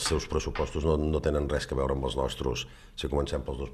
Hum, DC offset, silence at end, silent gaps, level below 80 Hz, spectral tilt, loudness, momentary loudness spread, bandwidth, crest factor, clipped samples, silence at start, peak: none; under 0.1%; 0 s; none; -38 dBFS; -5 dB/octave; -30 LUFS; 6 LU; 14 kHz; 16 dB; under 0.1%; 0 s; -14 dBFS